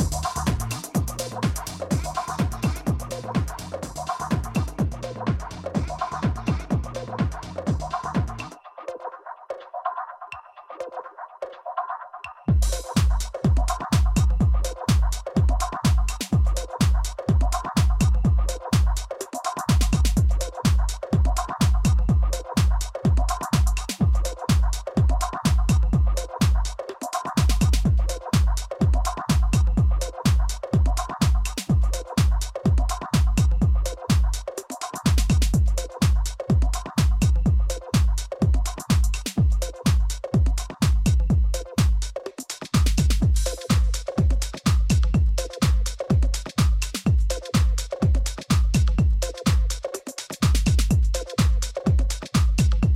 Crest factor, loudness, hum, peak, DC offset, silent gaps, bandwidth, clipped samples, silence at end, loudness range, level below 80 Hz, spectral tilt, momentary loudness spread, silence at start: 14 dB; -24 LUFS; none; -8 dBFS; under 0.1%; none; 15 kHz; under 0.1%; 0 s; 5 LU; -24 dBFS; -5.5 dB/octave; 10 LU; 0 s